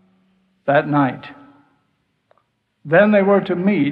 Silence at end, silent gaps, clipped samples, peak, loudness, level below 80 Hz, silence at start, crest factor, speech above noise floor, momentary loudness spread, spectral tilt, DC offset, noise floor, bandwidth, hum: 0 s; none; under 0.1%; -2 dBFS; -16 LUFS; -64 dBFS; 0.65 s; 18 dB; 52 dB; 15 LU; -10 dB/octave; under 0.1%; -67 dBFS; 4.8 kHz; none